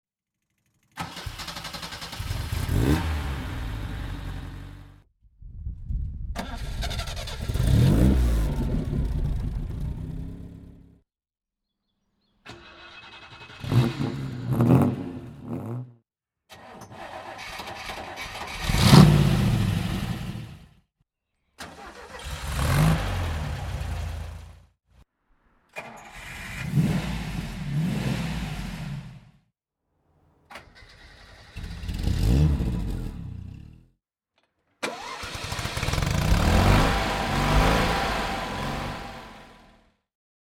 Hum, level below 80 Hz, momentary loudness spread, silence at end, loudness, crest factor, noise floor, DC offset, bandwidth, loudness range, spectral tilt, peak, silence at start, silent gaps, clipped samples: none; -34 dBFS; 22 LU; 1.05 s; -26 LUFS; 26 dB; under -90 dBFS; under 0.1%; 17 kHz; 15 LU; -6 dB/octave; -2 dBFS; 0.95 s; none; under 0.1%